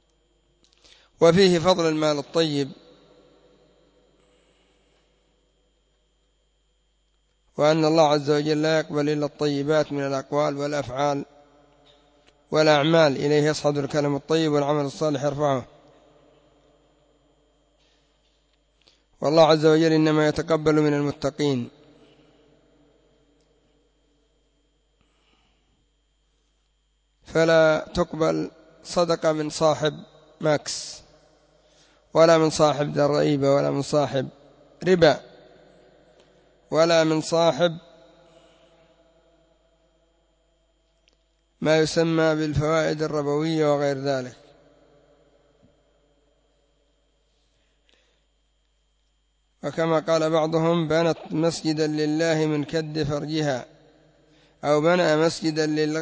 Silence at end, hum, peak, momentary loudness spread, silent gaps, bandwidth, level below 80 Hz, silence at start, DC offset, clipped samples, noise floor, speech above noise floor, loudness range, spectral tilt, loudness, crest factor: 0 s; none; -6 dBFS; 10 LU; none; 8 kHz; -56 dBFS; 1.2 s; under 0.1%; under 0.1%; -68 dBFS; 47 dB; 8 LU; -5.5 dB/octave; -22 LUFS; 18 dB